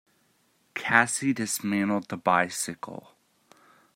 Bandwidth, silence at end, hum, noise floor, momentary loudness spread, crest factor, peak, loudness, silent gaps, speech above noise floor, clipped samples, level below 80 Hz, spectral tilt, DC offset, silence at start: 16 kHz; 0.95 s; none; -68 dBFS; 17 LU; 26 dB; -4 dBFS; -26 LUFS; none; 41 dB; under 0.1%; -74 dBFS; -3.5 dB/octave; under 0.1%; 0.75 s